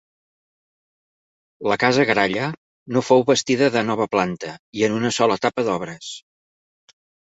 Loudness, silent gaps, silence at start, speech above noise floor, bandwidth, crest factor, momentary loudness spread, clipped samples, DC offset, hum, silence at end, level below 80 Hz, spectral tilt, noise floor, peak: -20 LUFS; 2.57-2.86 s, 4.59-4.73 s; 1.6 s; over 70 dB; 8.2 kHz; 20 dB; 15 LU; under 0.1%; under 0.1%; none; 1.1 s; -60 dBFS; -4.5 dB/octave; under -90 dBFS; -2 dBFS